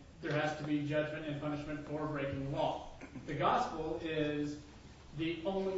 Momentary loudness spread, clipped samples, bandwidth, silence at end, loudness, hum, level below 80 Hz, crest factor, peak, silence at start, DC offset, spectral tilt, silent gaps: 13 LU; under 0.1%; 7.6 kHz; 0 s; -37 LUFS; none; -58 dBFS; 20 dB; -18 dBFS; 0 s; under 0.1%; -5 dB/octave; none